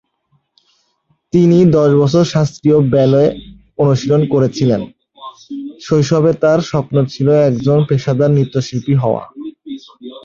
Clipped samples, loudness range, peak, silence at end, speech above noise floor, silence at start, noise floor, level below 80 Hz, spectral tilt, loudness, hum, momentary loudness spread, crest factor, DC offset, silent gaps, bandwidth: under 0.1%; 3 LU; 0 dBFS; 0.05 s; 50 dB; 1.35 s; -62 dBFS; -48 dBFS; -8 dB/octave; -13 LUFS; none; 19 LU; 14 dB; under 0.1%; none; 7.4 kHz